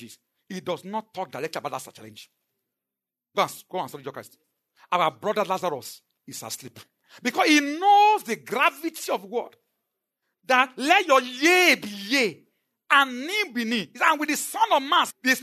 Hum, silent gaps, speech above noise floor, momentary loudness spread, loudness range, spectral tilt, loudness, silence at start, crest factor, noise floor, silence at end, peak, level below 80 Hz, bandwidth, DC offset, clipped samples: none; none; 65 dB; 17 LU; 12 LU; -2.5 dB/octave; -23 LUFS; 0 s; 22 dB; -89 dBFS; 0 s; -4 dBFS; -84 dBFS; 13.5 kHz; under 0.1%; under 0.1%